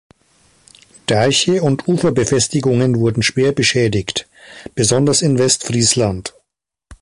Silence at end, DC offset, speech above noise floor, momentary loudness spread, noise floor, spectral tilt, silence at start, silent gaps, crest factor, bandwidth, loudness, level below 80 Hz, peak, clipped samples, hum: 0.05 s; under 0.1%; 58 dB; 10 LU; -73 dBFS; -4 dB/octave; 1.1 s; none; 16 dB; 11.5 kHz; -15 LUFS; -44 dBFS; 0 dBFS; under 0.1%; none